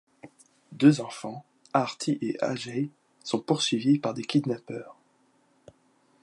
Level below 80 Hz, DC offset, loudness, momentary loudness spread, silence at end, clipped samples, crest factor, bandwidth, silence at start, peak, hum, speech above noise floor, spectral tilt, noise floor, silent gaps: -76 dBFS; under 0.1%; -27 LUFS; 18 LU; 1.3 s; under 0.1%; 22 dB; 11.5 kHz; 0.25 s; -6 dBFS; none; 39 dB; -5.5 dB/octave; -66 dBFS; none